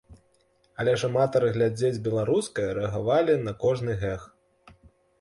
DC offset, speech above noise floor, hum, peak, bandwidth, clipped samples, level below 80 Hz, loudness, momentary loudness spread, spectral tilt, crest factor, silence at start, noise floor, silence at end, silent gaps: under 0.1%; 41 dB; none; -10 dBFS; 11.5 kHz; under 0.1%; -52 dBFS; -26 LUFS; 7 LU; -6.5 dB/octave; 16 dB; 0.1 s; -65 dBFS; 0.95 s; none